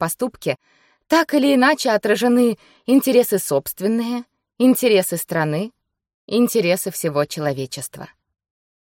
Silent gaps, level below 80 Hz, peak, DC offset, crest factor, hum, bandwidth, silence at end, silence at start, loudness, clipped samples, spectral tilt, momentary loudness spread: 6.14-6.28 s; -64 dBFS; -4 dBFS; under 0.1%; 16 dB; none; 17 kHz; 0.75 s; 0 s; -19 LUFS; under 0.1%; -4.5 dB/octave; 13 LU